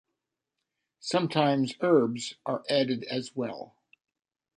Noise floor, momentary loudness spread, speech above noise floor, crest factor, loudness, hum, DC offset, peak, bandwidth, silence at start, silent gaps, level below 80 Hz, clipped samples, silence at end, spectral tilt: -85 dBFS; 13 LU; 58 dB; 20 dB; -28 LUFS; none; under 0.1%; -10 dBFS; 11 kHz; 1.05 s; none; -76 dBFS; under 0.1%; 0.9 s; -5.5 dB/octave